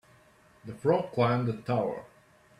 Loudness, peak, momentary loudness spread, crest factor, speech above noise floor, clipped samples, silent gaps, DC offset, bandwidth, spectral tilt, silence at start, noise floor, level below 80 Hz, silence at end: -29 LUFS; -12 dBFS; 17 LU; 18 dB; 32 dB; under 0.1%; none; under 0.1%; 11.5 kHz; -8 dB/octave; 0.65 s; -60 dBFS; -66 dBFS; 0.55 s